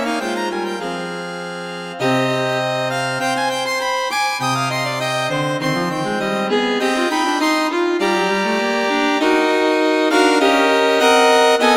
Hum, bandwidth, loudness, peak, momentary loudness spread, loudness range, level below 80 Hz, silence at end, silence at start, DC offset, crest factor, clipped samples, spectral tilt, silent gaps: none; 19 kHz; -17 LUFS; -2 dBFS; 9 LU; 5 LU; -56 dBFS; 0 s; 0 s; under 0.1%; 16 dB; under 0.1%; -4 dB/octave; none